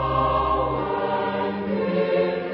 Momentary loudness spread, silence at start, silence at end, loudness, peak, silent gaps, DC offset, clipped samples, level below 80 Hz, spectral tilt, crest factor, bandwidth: 4 LU; 0 s; 0 s; -23 LUFS; -10 dBFS; none; under 0.1%; under 0.1%; -40 dBFS; -11 dB/octave; 14 dB; 5.8 kHz